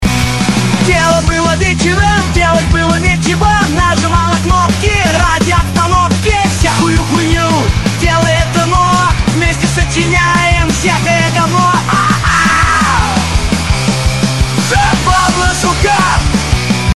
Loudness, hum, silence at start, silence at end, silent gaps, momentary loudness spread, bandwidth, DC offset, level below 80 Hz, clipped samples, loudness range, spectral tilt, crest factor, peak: -10 LUFS; none; 0 s; 0.05 s; none; 3 LU; 13 kHz; 2%; -20 dBFS; under 0.1%; 1 LU; -4.5 dB/octave; 10 dB; 0 dBFS